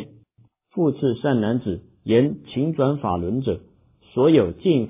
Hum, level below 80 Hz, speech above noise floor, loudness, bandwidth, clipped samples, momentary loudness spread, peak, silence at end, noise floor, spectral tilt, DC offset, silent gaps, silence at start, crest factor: none; -48 dBFS; 39 dB; -22 LUFS; 3.8 kHz; under 0.1%; 13 LU; -4 dBFS; 0 s; -59 dBFS; -12 dB/octave; under 0.1%; none; 0 s; 18 dB